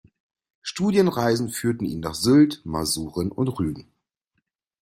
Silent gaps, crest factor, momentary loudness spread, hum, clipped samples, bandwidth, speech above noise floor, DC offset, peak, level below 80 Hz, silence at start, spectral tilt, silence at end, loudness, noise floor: none; 18 dB; 11 LU; none; under 0.1%; 16 kHz; 55 dB; under 0.1%; -6 dBFS; -52 dBFS; 0.65 s; -5.5 dB/octave; 1 s; -23 LUFS; -77 dBFS